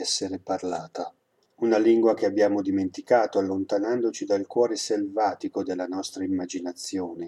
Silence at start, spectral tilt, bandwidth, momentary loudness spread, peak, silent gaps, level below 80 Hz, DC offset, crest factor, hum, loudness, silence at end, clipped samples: 0 s; -4 dB/octave; 12 kHz; 10 LU; -8 dBFS; none; -74 dBFS; under 0.1%; 18 dB; none; -26 LUFS; 0 s; under 0.1%